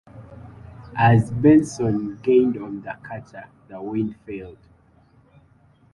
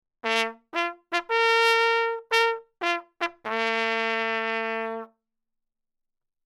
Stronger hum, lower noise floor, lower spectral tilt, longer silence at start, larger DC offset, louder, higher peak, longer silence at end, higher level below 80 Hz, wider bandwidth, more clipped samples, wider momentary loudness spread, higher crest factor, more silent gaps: neither; second, -56 dBFS vs -81 dBFS; first, -8 dB/octave vs -1.5 dB/octave; about the same, 0.15 s vs 0.25 s; neither; first, -20 LUFS vs -25 LUFS; about the same, -4 dBFS vs -6 dBFS; about the same, 1.4 s vs 1.4 s; first, -50 dBFS vs -80 dBFS; second, 11.5 kHz vs 15 kHz; neither; first, 26 LU vs 10 LU; about the same, 18 dB vs 20 dB; neither